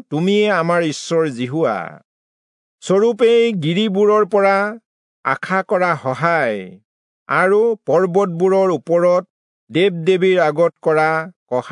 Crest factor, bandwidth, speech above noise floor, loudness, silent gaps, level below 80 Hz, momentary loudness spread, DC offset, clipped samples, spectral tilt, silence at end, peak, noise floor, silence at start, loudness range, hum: 14 dB; 11 kHz; over 74 dB; -16 LUFS; 2.05-2.79 s, 4.86-5.23 s, 6.85-7.26 s, 9.30-9.67 s, 11.36-11.46 s; -74 dBFS; 9 LU; under 0.1%; under 0.1%; -6 dB/octave; 0 s; -2 dBFS; under -90 dBFS; 0.1 s; 2 LU; none